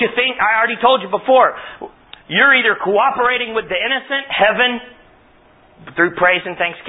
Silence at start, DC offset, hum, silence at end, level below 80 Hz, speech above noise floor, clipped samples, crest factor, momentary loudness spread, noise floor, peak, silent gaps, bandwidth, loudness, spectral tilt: 0 s; under 0.1%; none; 0 s; -56 dBFS; 33 dB; under 0.1%; 16 dB; 12 LU; -49 dBFS; 0 dBFS; none; 4 kHz; -14 LUFS; -9 dB/octave